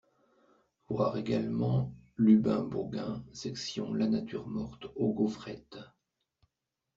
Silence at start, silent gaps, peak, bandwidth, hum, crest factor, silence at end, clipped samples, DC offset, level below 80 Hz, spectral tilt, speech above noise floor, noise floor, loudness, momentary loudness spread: 0.9 s; none; -14 dBFS; 7.6 kHz; none; 20 dB; 1.1 s; under 0.1%; under 0.1%; -62 dBFS; -7.5 dB/octave; 56 dB; -87 dBFS; -32 LUFS; 16 LU